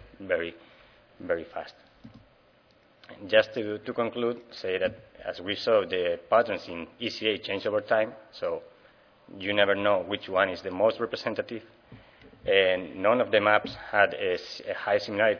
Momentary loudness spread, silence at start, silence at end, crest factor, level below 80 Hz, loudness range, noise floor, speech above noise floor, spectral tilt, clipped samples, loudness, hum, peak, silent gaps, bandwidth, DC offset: 14 LU; 0.2 s; 0 s; 24 dB; -64 dBFS; 5 LU; -61 dBFS; 34 dB; -5 dB/octave; under 0.1%; -27 LUFS; none; -4 dBFS; none; 5.4 kHz; under 0.1%